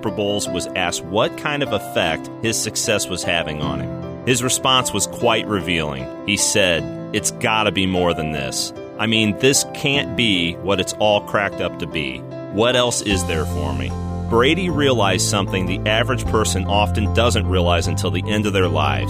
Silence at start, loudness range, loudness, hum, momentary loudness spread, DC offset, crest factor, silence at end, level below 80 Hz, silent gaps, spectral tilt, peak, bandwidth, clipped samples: 0 s; 2 LU; -19 LUFS; none; 8 LU; under 0.1%; 16 dB; 0 s; -36 dBFS; none; -3.5 dB/octave; -4 dBFS; 15.5 kHz; under 0.1%